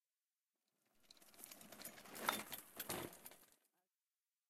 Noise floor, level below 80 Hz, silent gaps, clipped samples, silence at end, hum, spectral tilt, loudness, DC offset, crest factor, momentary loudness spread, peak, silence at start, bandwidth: under -90 dBFS; -84 dBFS; none; under 0.1%; 0.95 s; none; -2 dB/octave; -49 LUFS; under 0.1%; 34 dB; 22 LU; -20 dBFS; 1.1 s; 16 kHz